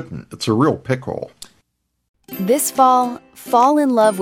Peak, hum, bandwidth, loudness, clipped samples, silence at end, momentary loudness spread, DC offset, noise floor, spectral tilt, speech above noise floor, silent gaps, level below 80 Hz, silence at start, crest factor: -2 dBFS; none; 16.5 kHz; -16 LUFS; under 0.1%; 0 s; 19 LU; under 0.1%; -68 dBFS; -5 dB/octave; 52 dB; 2.08-2.14 s; -58 dBFS; 0 s; 16 dB